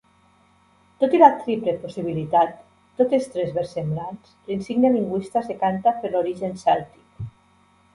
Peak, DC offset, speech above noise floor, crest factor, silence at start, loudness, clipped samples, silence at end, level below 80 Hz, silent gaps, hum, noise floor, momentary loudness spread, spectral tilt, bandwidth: 0 dBFS; under 0.1%; 37 dB; 22 dB; 1 s; -22 LUFS; under 0.1%; 0.65 s; -58 dBFS; none; none; -58 dBFS; 21 LU; -7.5 dB/octave; 11.5 kHz